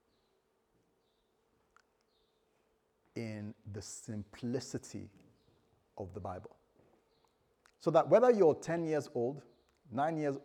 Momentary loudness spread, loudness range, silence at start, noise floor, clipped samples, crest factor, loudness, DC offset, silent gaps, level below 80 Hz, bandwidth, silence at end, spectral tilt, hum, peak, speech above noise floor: 22 LU; 18 LU; 3.15 s; -77 dBFS; under 0.1%; 22 dB; -33 LUFS; under 0.1%; none; -78 dBFS; 13 kHz; 0.05 s; -6.5 dB/octave; none; -14 dBFS; 43 dB